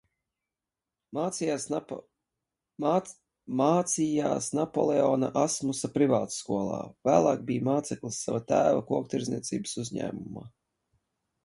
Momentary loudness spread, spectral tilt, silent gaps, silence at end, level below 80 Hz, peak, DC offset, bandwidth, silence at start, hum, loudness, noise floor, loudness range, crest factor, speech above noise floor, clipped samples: 10 LU; -5.5 dB/octave; none; 0.95 s; -66 dBFS; -8 dBFS; under 0.1%; 11.5 kHz; 1.1 s; none; -28 LUFS; -90 dBFS; 4 LU; 22 dB; 62 dB; under 0.1%